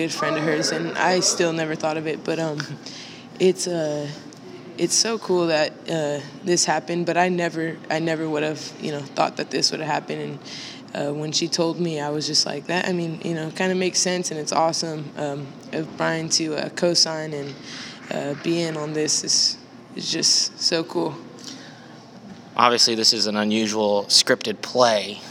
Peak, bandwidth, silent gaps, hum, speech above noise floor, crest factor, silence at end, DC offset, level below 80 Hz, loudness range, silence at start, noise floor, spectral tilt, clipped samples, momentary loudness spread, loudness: 0 dBFS; 18 kHz; none; none; 20 dB; 24 dB; 0 s; under 0.1%; -74 dBFS; 5 LU; 0 s; -43 dBFS; -3 dB/octave; under 0.1%; 16 LU; -22 LUFS